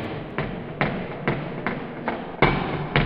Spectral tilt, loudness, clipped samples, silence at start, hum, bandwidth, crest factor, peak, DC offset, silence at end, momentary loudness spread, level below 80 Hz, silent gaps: -9 dB/octave; -26 LUFS; under 0.1%; 0 s; none; 5.6 kHz; 26 dB; 0 dBFS; under 0.1%; 0 s; 9 LU; -40 dBFS; none